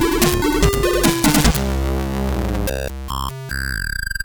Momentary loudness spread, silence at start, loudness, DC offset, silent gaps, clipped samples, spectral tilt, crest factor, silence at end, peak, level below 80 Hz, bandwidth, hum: 11 LU; 0 s; -19 LUFS; under 0.1%; none; under 0.1%; -4.5 dB/octave; 16 dB; 0 s; -2 dBFS; -24 dBFS; over 20 kHz; none